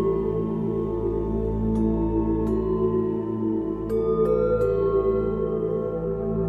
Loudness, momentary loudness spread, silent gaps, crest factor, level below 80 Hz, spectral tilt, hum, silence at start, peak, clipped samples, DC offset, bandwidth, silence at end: -24 LUFS; 5 LU; none; 12 dB; -36 dBFS; -11 dB/octave; none; 0 s; -10 dBFS; under 0.1%; under 0.1%; 4.2 kHz; 0 s